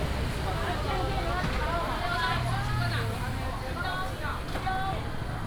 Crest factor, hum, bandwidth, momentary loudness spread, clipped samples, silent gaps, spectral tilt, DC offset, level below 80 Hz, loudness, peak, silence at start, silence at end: 14 dB; none; over 20 kHz; 5 LU; under 0.1%; none; -5.5 dB/octave; under 0.1%; -36 dBFS; -31 LUFS; -16 dBFS; 0 s; 0 s